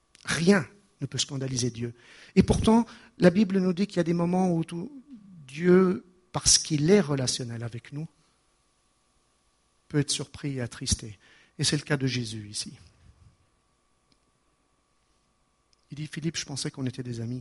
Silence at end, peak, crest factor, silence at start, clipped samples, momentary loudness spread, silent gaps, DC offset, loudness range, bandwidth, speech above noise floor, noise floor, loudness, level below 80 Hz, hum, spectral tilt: 0 s; -4 dBFS; 24 dB; 0.25 s; under 0.1%; 17 LU; none; under 0.1%; 13 LU; 11.5 kHz; 44 dB; -70 dBFS; -26 LUFS; -48 dBFS; none; -4.5 dB/octave